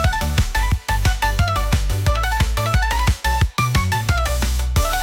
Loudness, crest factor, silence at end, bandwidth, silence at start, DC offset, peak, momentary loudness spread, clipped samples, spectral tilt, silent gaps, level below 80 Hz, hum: -20 LUFS; 12 dB; 0 s; 17 kHz; 0 s; under 0.1%; -6 dBFS; 2 LU; under 0.1%; -4.5 dB/octave; none; -22 dBFS; none